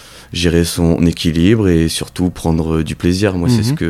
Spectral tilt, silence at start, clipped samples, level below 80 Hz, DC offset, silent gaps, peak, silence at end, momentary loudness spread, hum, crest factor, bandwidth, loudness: -6 dB/octave; 0.05 s; under 0.1%; -30 dBFS; under 0.1%; none; 0 dBFS; 0 s; 6 LU; none; 14 dB; 15.5 kHz; -15 LUFS